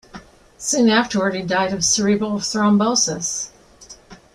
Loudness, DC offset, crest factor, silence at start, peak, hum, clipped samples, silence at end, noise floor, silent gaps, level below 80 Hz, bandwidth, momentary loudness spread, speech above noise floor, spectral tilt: -18 LUFS; under 0.1%; 18 dB; 0.15 s; -2 dBFS; none; under 0.1%; 0.2 s; -45 dBFS; none; -52 dBFS; 13 kHz; 8 LU; 26 dB; -3 dB/octave